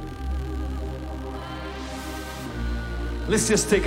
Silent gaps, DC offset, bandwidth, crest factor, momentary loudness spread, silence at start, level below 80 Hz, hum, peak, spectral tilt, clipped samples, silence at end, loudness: none; under 0.1%; 16 kHz; 20 dB; 13 LU; 0 s; -32 dBFS; none; -6 dBFS; -4 dB/octave; under 0.1%; 0 s; -28 LUFS